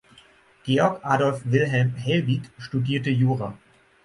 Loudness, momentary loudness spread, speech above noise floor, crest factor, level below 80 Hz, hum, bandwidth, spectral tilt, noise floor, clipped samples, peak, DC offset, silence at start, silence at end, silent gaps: -23 LUFS; 7 LU; 32 dB; 18 dB; -60 dBFS; none; 11 kHz; -7 dB/octave; -55 dBFS; under 0.1%; -6 dBFS; under 0.1%; 0.65 s; 0.5 s; none